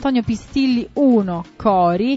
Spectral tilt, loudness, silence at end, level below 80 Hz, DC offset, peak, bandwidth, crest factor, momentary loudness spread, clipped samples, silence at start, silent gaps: -7 dB/octave; -18 LUFS; 0 s; -44 dBFS; under 0.1%; -4 dBFS; 8 kHz; 14 dB; 6 LU; under 0.1%; 0 s; none